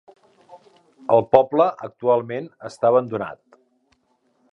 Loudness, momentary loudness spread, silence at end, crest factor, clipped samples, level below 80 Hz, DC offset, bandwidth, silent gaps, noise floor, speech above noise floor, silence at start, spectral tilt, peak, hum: -20 LUFS; 16 LU; 1.2 s; 22 dB; under 0.1%; -64 dBFS; under 0.1%; 10 kHz; none; -66 dBFS; 46 dB; 0.55 s; -7.5 dB/octave; 0 dBFS; none